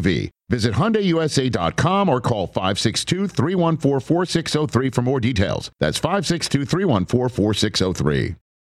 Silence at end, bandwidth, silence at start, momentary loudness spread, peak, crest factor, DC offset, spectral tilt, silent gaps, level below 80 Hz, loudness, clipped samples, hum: 0.25 s; 14 kHz; 0 s; 4 LU; -4 dBFS; 16 dB; under 0.1%; -5.5 dB/octave; none; -42 dBFS; -20 LUFS; under 0.1%; none